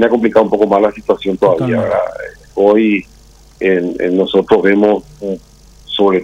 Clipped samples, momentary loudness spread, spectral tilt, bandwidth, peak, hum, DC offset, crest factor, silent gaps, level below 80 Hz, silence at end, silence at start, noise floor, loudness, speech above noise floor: under 0.1%; 13 LU; -7 dB/octave; 9.6 kHz; 0 dBFS; none; under 0.1%; 12 dB; none; -46 dBFS; 0 s; 0 s; -42 dBFS; -13 LUFS; 30 dB